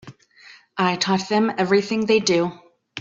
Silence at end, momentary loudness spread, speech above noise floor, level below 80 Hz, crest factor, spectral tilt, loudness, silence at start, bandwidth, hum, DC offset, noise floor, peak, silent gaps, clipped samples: 0 s; 9 LU; 29 dB; -64 dBFS; 16 dB; -4.5 dB/octave; -20 LUFS; 0.05 s; 7.8 kHz; none; under 0.1%; -49 dBFS; -6 dBFS; none; under 0.1%